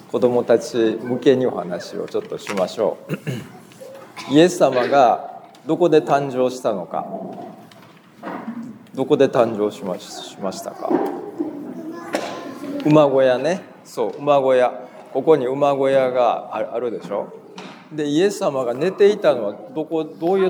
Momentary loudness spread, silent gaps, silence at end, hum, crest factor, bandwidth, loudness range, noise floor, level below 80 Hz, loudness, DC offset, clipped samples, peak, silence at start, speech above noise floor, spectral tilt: 18 LU; none; 0 s; none; 20 dB; over 20 kHz; 5 LU; -46 dBFS; -76 dBFS; -20 LUFS; under 0.1%; under 0.1%; 0 dBFS; 0.15 s; 27 dB; -6 dB/octave